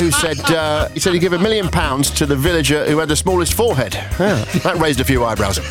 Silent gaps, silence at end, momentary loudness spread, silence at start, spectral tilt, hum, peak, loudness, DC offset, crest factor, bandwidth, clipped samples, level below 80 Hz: none; 0 s; 3 LU; 0 s; -4.5 dB/octave; none; 0 dBFS; -16 LUFS; under 0.1%; 14 dB; over 20 kHz; under 0.1%; -30 dBFS